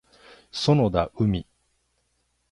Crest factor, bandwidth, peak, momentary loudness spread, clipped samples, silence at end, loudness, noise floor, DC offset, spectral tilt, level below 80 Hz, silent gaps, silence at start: 20 dB; 11.5 kHz; -6 dBFS; 10 LU; under 0.1%; 1.1 s; -24 LUFS; -72 dBFS; under 0.1%; -7 dB/octave; -46 dBFS; none; 0.55 s